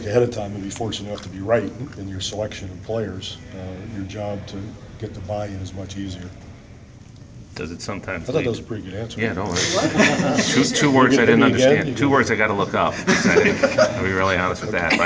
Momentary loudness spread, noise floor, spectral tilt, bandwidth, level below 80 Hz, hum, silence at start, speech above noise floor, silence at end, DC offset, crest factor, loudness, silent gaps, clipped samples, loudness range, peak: 18 LU; -42 dBFS; -4.5 dB/octave; 8 kHz; -44 dBFS; none; 0 s; 22 dB; 0 s; under 0.1%; 20 dB; -20 LUFS; none; under 0.1%; 15 LU; 0 dBFS